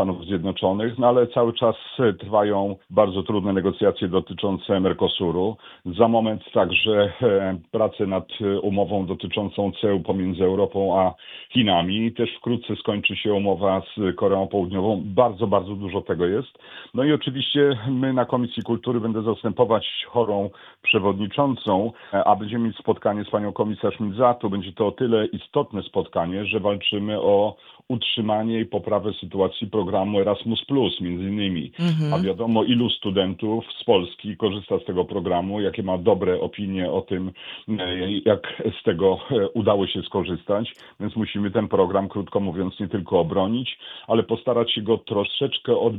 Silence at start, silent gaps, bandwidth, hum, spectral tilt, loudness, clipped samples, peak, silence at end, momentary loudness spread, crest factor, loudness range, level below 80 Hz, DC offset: 0 s; none; 4.9 kHz; none; -8.5 dB/octave; -23 LUFS; under 0.1%; -2 dBFS; 0 s; 7 LU; 20 dB; 2 LU; -56 dBFS; under 0.1%